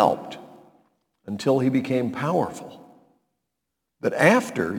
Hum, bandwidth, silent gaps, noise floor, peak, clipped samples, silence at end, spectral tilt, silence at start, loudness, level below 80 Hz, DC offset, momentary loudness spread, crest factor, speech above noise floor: none; 18.5 kHz; none; -82 dBFS; 0 dBFS; under 0.1%; 0 s; -6 dB/octave; 0 s; -23 LUFS; -66 dBFS; under 0.1%; 21 LU; 24 dB; 60 dB